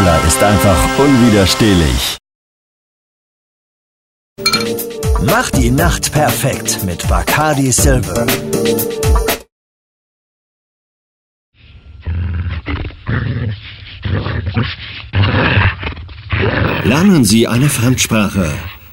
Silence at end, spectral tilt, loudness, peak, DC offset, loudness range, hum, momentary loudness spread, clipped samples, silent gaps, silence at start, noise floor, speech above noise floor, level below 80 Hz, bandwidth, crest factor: 0.1 s; -4.5 dB/octave; -13 LUFS; -2 dBFS; under 0.1%; 10 LU; none; 12 LU; under 0.1%; 2.35-4.36 s, 9.52-11.52 s; 0 s; -37 dBFS; 25 dB; -24 dBFS; 16.5 kHz; 14 dB